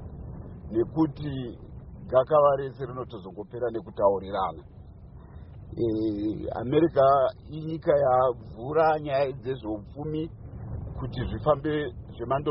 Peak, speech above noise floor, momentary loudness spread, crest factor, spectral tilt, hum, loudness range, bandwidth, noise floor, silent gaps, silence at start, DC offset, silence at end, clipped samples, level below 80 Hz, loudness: -8 dBFS; 20 dB; 20 LU; 18 dB; -6.5 dB/octave; none; 6 LU; 5.8 kHz; -46 dBFS; none; 0 s; under 0.1%; 0 s; under 0.1%; -46 dBFS; -27 LUFS